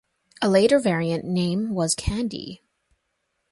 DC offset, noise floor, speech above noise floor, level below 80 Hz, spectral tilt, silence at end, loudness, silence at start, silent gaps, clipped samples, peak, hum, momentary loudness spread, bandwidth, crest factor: under 0.1%; -75 dBFS; 53 dB; -42 dBFS; -5 dB/octave; 0.95 s; -22 LUFS; 0.4 s; none; under 0.1%; -6 dBFS; none; 12 LU; 11.5 kHz; 18 dB